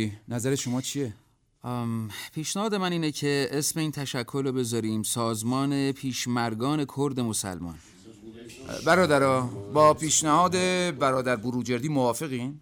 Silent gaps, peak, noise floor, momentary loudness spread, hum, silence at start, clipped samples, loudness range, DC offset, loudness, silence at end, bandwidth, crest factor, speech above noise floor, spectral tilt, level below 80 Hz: none; -8 dBFS; -46 dBFS; 13 LU; none; 0 s; under 0.1%; 6 LU; under 0.1%; -26 LUFS; 0 s; 19 kHz; 18 dB; 20 dB; -4.5 dB/octave; -60 dBFS